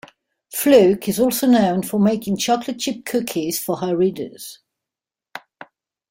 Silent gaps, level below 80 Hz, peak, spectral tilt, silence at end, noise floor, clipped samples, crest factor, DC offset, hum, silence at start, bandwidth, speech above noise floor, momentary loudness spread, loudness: none; -58 dBFS; 0 dBFS; -5 dB/octave; 0.7 s; -88 dBFS; under 0.1%; 20 dB; under 0.1%; none; 0.5 s; 16.5 kHz; 70 dB; 22 LU; -18 LUFS